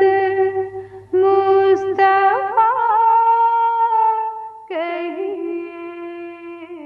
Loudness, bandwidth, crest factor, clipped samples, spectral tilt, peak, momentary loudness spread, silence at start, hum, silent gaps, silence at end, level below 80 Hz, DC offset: -16 LUFS; 6 kHz; 12 dB; under 0.1%; -6.5 dB/octave; -4 dBFS; 18 LU; 0 s; none; none; 0 s; -64 dBFS; under 0.1%